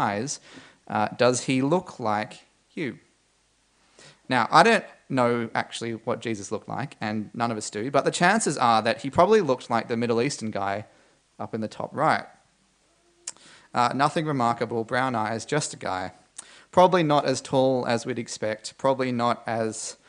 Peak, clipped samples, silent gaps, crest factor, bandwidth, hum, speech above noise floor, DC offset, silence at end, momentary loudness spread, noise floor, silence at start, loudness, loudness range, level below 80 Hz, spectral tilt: -2 dBFS; under 0.1%; none; 24 dB; 10.5 kHz; none; 41 dB; under 0.1%; 0.15 s; 14 LU; -66 dBFS; 0 s; -25 LUFS; 5 LU; -66 dBFS; -4.5 dB/octave